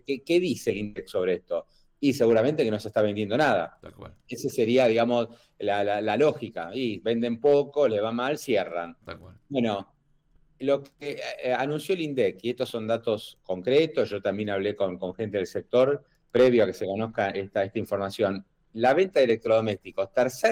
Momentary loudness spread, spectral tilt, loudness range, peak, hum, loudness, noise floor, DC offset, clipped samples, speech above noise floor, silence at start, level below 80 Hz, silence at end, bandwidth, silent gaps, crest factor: 12 LU; -6 dB/octave; 4 LU; -12 dBFS; none; -26 LUFS; -63 dBFS; under 0.1%; under 0.1%; 38 dB; 0.1 s; -64 dBFS; 0 s; 16.5 kHz; none; 14 dB